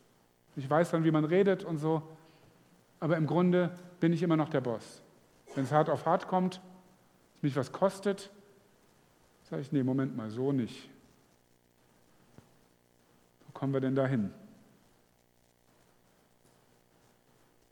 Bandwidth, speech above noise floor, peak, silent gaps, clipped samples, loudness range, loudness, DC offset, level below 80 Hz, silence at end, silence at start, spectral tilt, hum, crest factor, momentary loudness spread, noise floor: 13 kHz; 38 dB; -12 dBFS; none; under 0.1%; 8 LU; -31 LUFS; under 0.1%; -78 dBFS; 3.25 s; 0.55 s; -7.5 dB/octave; 60 Hz at -60 dBFS; 20 dB; 14 LU; -68 dBFS